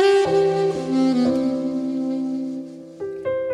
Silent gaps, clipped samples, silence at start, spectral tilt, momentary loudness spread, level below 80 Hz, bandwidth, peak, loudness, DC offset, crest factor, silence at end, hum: none; under 0.1%; 0 s; -6 dB/octave; 14 LU; -60 dBFS; 11 kHz; -6 dBFS; -21 LUFS; under 0.1%; 14 dB; 0 s; none